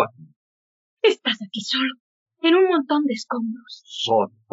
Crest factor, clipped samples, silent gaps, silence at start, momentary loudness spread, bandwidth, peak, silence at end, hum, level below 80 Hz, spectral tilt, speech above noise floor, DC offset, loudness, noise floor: 18 dB; under 0.1%; 0.36-0.97 s, 2.00-2.26 s; 0 s; 10 LU; 7.8 kHz; -4 dBFS; 0.25 s; none; -82 dBFS; -1.5 dB/octave; over 68 dB; under 0.1%; -22 LUFS; under -90 dBFS